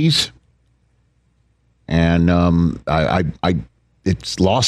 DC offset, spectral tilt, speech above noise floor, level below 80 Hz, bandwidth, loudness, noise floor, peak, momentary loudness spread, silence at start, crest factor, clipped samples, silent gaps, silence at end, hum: under 0.1%; -5.5 dB/octave; 44 dB; -34 dBFS; 12.5 kHz; -18 LUFS; -60 dBFS; -2 dBFS; 9 LU; 0 s; 16 dB; under 0.1%; none; 0 s; none